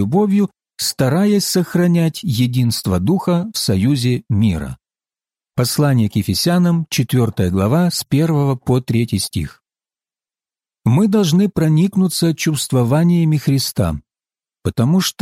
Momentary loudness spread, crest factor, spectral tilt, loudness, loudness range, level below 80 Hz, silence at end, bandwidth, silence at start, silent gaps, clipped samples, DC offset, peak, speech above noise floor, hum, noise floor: 7 LU; 12 dB; -6 dB/octave; -16 LUFS; 3 LU; -44 dBFS; 0.1 s; 16.5 kHz; 0 s; none; under 0.1%; under 0.1%; -4 dBFS; over 75 dB; none; under -90 dBFS